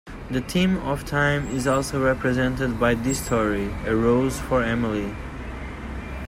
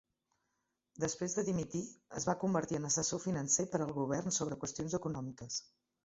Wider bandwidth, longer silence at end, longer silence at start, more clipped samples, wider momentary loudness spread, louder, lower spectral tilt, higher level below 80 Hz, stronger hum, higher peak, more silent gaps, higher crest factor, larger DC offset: first, 16 kHz vs 8 kHz; second, 0 s vs 0.4 s; second, 0.05 s vs 0.95 s; neither; first, 12 LU vs 9 LU; first, -23 LUFS vs -36 LUFS; about the same, -5.5 dB/octave vs -6 dB/octave; first, -36 dBFS vs -66 dBFS; neither; first, -6 dBFS vs -18 dBFS; neither; about the same, 16 dB vs 20 dB; neither